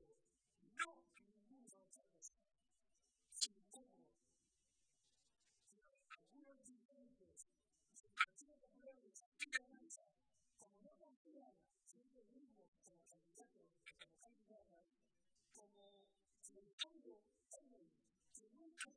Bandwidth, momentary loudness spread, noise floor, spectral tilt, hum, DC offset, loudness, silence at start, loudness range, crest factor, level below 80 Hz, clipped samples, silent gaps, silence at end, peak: 11 kHz; 24 LU; -89 dBFS; 1 dB/octave; none; under 0.1%; -48 LUFS; 0 s; 19 LU; 38 dB; under -90 dBFS; under 0.1%; 6.85-6.89 s, 9.26-9.32 s, 11.16-11.25 s, 12.68-12.72 s, 16.73-16.78 s; 0.05 s; -20 dBFS